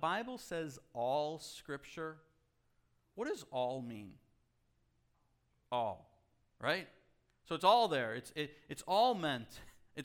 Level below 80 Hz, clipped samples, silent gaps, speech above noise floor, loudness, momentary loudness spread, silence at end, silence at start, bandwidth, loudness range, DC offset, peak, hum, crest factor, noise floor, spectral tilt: -72 dBFS; under 0.1%; none; 39 dB; -37 LUFS; 20 LU; 0 s; 0 s; 18 kHz; 10 LU; under 0.1%; -16 dBFS; none; 24 dB; -76 dBFS; -4.5 dB/octave